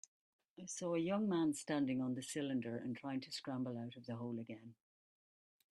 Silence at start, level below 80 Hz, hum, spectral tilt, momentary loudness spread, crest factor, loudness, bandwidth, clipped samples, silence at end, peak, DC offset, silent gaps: 0.6 s; -84 dBFS; none; -5 dB/octave; 11 LU; 18 dB; -41 LUFS; 12.5 kHz; under 0.1%; 1 s; -26 dBFS; under 0.1%; none